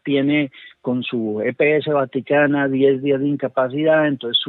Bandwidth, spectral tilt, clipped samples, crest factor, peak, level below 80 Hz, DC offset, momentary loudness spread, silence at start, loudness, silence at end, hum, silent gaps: 4.2 kHz; -9.5 dB/octave; under 0.1%; 14 dB; -4 dBFS; -70 dBFS; under 0.1%; 7 LU; 0.05 s; -19 LUFS; 0 s; none; none